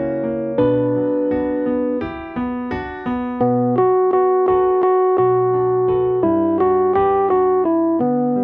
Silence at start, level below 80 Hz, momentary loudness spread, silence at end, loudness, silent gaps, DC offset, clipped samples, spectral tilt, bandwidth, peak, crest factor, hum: 0 s; -46 dBFS; 8 LU; 0 s; -17 LUFS; none; under 0.1%; under 0.1%; -11 dB/octave; 4 kHz; -4 dBFS; 12 dB; none